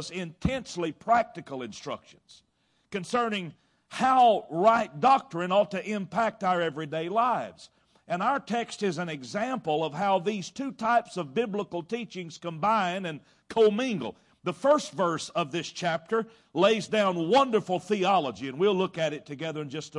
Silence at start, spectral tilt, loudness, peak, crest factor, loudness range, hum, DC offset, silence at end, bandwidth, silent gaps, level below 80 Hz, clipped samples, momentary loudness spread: 0 s; -5 dB/octave; -27 LUFS; -10 dBFS; 18 dB; 5 LU; none; under 0.1%; 0 s; 11.5 kHz; none; -60 dBFS; under 0.1%; 13 LU